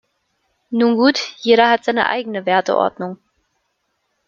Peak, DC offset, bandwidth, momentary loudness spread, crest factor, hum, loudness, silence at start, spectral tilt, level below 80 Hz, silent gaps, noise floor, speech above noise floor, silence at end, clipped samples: -2 dBFS; under 0.1%; 7.4 kHz; 10 LU; 18 dB; none; -16 LUFS; 0.7 s; -4.5 dB/octave; -64 dBFS; none; -70 dBFS; 54 dB; 1.1 s; under 0.1%